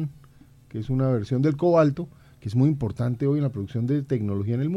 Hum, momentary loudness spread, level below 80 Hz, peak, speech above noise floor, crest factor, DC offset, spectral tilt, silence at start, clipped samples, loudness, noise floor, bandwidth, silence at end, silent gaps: none; 14 LU; -52 dBFS; -8 dBFS; 29 dB; 16 dB; under 0.1%; -9.5 dB/octave; 0 s; under 0.1%; -24 LUFS; -52 dBFS; 7.6 kHz; 0 s; none